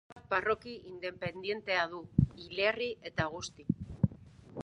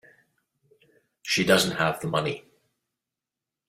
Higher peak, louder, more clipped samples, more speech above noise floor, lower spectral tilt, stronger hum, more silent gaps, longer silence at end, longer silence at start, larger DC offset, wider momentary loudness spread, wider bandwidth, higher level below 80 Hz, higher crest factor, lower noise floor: second, -10 dBFS vs -4 dBFS; second, -34 LUFS vs -24 LUFS; neither; second, 18 dB vs 64 dB; first, -6 dB/octave vs -3.5 dB/octave; neither; first, 0.12-0.16 s vs none; second, 0 s vs 1.3 s; second, 0.1 s vs 1.25 s; neither; second, 10 LU vs 16 LU; second, 10.5 kHz vs 16 kHz; first, -52 dBFS vs -64 dBFS; about the same, 24 dB vs 24 dB; second, -53 dBFS vs -88 dBFS